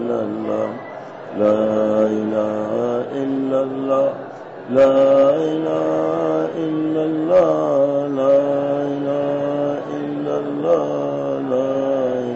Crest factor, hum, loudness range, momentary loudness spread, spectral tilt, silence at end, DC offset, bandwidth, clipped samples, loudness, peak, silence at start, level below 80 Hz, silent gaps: 12 dB; none; 4 LU; 8 LU; -7.5 dB/octave; 0 s; under 0.1%; 7.4 kHz; under 0.1%; -19 LUFS; -6 dBFS; 0 s; -64 dBFS; none